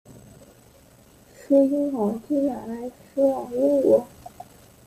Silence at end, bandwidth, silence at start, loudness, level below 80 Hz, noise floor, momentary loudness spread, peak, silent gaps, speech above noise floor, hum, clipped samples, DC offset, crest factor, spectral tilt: 0.6 s; 15 kHz; 0.1 s; -23 LUFS; -60 dBFS; -53 dBFS; 16 LU; -8 dBFS; none; 31 dB; none; under 0.1%; under 0.1%; 18 dB; -8 dB/octave